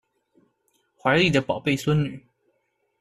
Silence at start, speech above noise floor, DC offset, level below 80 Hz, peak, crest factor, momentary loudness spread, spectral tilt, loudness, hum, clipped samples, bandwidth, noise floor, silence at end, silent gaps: 1.05 s; 50 dB; under 0.1%; -54 dBFS; -6 dBFS; 20 dB; 11 LU; -6 dB/octave; -23 LUFS; none; under 0.1%; 14 kHz; -72 dBFS; 0.8 s; none